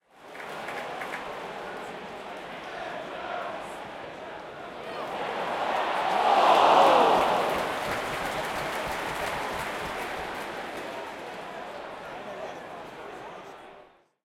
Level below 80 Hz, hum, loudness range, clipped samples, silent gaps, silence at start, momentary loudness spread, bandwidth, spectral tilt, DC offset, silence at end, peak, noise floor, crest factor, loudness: -58 dBFS; none; 14 LU; under 0.1%; none; 0.15 s; 20 LU; 16.5 kHz; -3.5 dB/octave; under 0.1%; 0.4 s; -8 dBFS; -55 dBFS; 22 dB; -28 LUFS